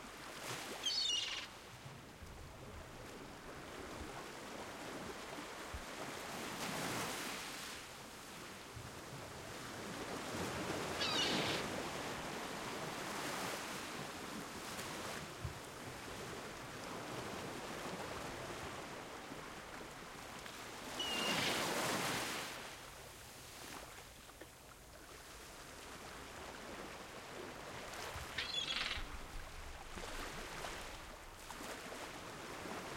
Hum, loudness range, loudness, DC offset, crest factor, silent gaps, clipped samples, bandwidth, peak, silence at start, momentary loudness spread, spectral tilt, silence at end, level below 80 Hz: none; 10 LU; -44 LUFS; under 0.1%; 20 dB; none; under 0.1%; 16.5 kHz; -24 dBFS; 0 s; 15 LU; -2.5 dB/octave; 0 s; -62 dBFS